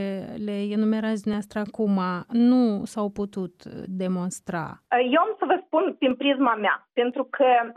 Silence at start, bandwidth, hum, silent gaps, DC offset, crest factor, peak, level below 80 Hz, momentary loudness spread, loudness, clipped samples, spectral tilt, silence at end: 0 s; 12.5 kHz; none; none; under 0.1%; 16 dB; -8 dBFS; -64 dBFS; 11 LU; -24 LUFS; under 0.1%; -6 dB/octave; 0.05 s